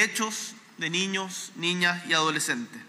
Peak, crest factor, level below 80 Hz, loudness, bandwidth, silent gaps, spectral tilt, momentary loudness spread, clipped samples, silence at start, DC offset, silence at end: -10 dBFS; 20 dB; -86 dBFS; -27 LUFS; 15.5 kHz; none; -2 dB/octave; 11 LU; under 0.1%; 0 s; under 0.1%; 0 s